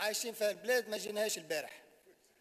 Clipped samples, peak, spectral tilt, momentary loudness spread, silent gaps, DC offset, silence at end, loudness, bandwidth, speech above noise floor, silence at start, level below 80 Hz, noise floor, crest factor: under 0.1%; -22 dBFS; -1 dB/octave; 9 LU; none; under 0.1%; 0.6 s; -36 LUFS; 15.5 kHz; 29 dB; 0 s; under -90 dBFS; -66 dBFS; 16 dB